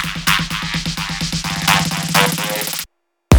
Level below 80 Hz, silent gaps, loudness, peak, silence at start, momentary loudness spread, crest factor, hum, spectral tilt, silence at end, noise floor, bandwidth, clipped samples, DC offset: -38 dBFS; none; -17 LUFS; 0 dBFS; 0 s; 7 LU; 18 dB; none; -3.5 dB/octave; 0 s; -39 dBFS; over 20 kHz; under 0.1%; under 0.1%